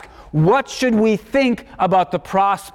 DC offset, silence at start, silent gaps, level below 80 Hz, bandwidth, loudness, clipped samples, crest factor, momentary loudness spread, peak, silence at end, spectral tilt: under 0.1%; 0.2 s; none; -46 dBFS; 16 kHz; -18 LUFS; under 0.1%; 12 dB; 4 LU; -6 dBFS; 0.05 s; -6 dB/octave